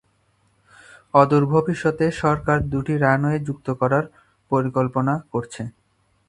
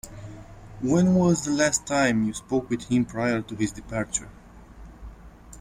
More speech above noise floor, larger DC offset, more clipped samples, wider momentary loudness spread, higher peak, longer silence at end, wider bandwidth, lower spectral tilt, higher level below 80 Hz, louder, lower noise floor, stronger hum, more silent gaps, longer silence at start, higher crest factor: first, 43 dB vs 22 dB; neither; neither; second, 11 LU vs 22 LU; first, 0 dBFS vs -8 dBFS; first, 0.6 s vs 0 s; second, 11 kHz vs 15.5 kHz; first, -8 dB/octave vs -5 dB/octave; about the same, -46 dBFS vs -48 dBFS; first, -21 LUFS vs -24 LUFS; first, -64 dBFS vs -46 dBFS; neither; neither; first, 1.15 s vs 0.05 s; about the same, 22 dB vs 18 dB